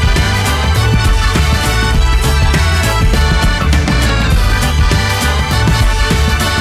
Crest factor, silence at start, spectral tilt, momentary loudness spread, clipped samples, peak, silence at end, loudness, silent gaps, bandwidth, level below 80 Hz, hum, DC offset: 8 dB; 0 s; -4.5 dB/octave; 1 LU; under 0.1%; -2 dBFS; 0 s; -12 LUFS; none; 16 kHz; -14 dBFS; none; under 0.1%